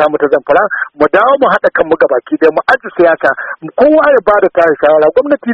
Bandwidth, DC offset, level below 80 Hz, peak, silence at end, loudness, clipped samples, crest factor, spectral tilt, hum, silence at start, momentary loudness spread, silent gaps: 6.2 kHz; under 0.1%; -46 dBFS; 0 dBFS; 0 s; -10 LUFS; 0.2%; 10 dB; -7 dB/octave; none; 0 s; 5 LU; none